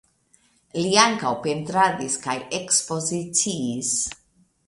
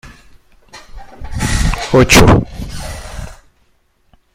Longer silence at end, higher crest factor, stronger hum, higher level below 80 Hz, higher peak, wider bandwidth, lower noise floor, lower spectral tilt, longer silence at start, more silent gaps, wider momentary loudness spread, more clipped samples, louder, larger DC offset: second, 0.55 s vs 1 s; first, 24 dB vs 16 dB; neither; second, -60 dBFS vs -24 dBFS; about the same, 0 dBFS vs 0 dBFS; second, 11.5 kHz vs 16.5 kHz; first, -62 dBFS vs -56 dBFS; second, -2.5 dB/octave vs -4.5 dB/octave; first, 0.75 s vs 0.05 s; neither; second, 10 LU vs 24 LU; neither; second, -22 LUFS vs -11 LUFS; neither